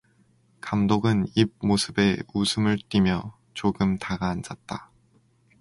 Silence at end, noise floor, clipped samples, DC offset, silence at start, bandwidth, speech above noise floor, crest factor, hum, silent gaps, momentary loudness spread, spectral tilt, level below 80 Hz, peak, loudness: 0.8 s; -62 dBFS; under 0.1%; under 0.1%; 0.65 s; 11.5 kHz; 38 dB; 20 dB; none; none; 14 LU; -5.5 dB/octave; -48 dBFS; -6 dBFS; -25 LUFS